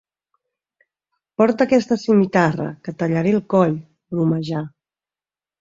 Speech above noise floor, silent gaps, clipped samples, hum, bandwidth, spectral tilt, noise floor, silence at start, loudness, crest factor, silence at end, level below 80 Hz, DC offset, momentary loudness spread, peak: over 72 dB; none; under 0.1%; none; 7.6 kHz; -7.5 dB/octave; under -90 dBFS; 1.4 s; -19 LUFS; 18 dB; 0.9 s; -60 dBFS; under 0.1%; 12 LU; -2 dBFS